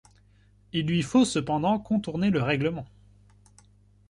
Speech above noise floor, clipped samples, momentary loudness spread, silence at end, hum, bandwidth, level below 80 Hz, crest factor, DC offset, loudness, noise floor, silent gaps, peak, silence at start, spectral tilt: 34 dB; under 0.1%; 9 LU; 1.25 s; 50 Hz at -45 dBFS; 11.5 kHz; -56 dBFS; 16 dB; under 0.1%; -26 LUFS; -59 dBFS; none; -10 dBFS; 0.75 s; -6 dB/octave